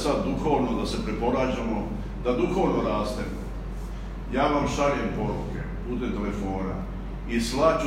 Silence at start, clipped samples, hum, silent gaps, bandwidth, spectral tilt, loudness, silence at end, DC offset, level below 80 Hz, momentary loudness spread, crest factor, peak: 0 s; under 0.1%; none; none; 15 kHz; -6 dB/octave; -27 LUFS; 0 s; under 0.1%; -36 dBFS; 12 LU; 18 dB; -8 dBFS